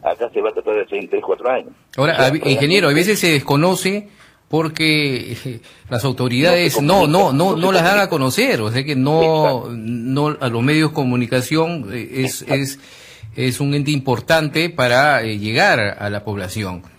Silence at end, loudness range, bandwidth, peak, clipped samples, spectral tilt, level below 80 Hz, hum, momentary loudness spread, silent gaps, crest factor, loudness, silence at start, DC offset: 0.15 s; 5 LU; 16 kHz; 0 dBFS; under 0.1%; -5 dB/octave; -52 dBFS; none; 11 LU; none; 16 dB; -17 LUFS; 0.05 s; under 0.1%